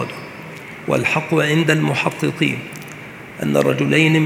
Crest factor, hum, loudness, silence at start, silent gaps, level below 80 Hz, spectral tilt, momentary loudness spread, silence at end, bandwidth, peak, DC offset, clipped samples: 18 dB; none; -18 LUFS; 0 s; none; -58 dBFS; -5.5 dB/octave; 18 LU; 0 s; 16 kHz; 0 dBFS; under 0.1%; under 0.1%